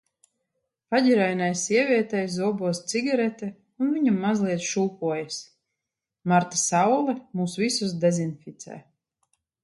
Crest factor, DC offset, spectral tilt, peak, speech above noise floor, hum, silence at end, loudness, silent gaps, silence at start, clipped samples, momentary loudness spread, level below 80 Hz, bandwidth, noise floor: 18 dB; under 0.1%; -4.5 dB/octave; -6 dBFS; 62 dB; none; 0.85 s; -24 LUFS; none; 0.9 s; under 0.1%; 14 LU; -72 dBFS; 11.5 kHz; -86 dBFS